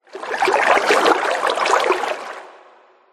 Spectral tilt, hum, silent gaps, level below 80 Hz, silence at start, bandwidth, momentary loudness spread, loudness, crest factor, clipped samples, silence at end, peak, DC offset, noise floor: -1.5 dB/octave; none; none; -66 dBFS; 0.15 s; 15.5 kHz; 14 LU; -17 LUFS; 18 dB; under 0.1%; 0.6 s; -2 dBFS; under 0.1%; -50 dBFS